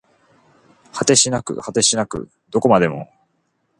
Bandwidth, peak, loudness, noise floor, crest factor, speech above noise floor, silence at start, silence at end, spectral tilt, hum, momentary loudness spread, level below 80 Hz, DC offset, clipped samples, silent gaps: 11.5 kHz; 0 dBFS; -17 LUFS; -67 dBFS; 20 dB; 50 dB; 0.95 s; 0.75 s; -3 dB/octave; none; 16 LU; -54 dBFS; under 0.1%; under 0.1%; none